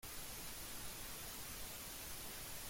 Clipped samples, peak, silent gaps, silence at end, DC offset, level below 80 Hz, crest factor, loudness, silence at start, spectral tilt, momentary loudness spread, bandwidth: under 0.1%; -36 dBFS; none; 0 s; under 0.1%; -60 dBFS; 14 dB; -48 LUFS; 0 s; -1.5 dB/octave; 0 LU; 16.5 kHz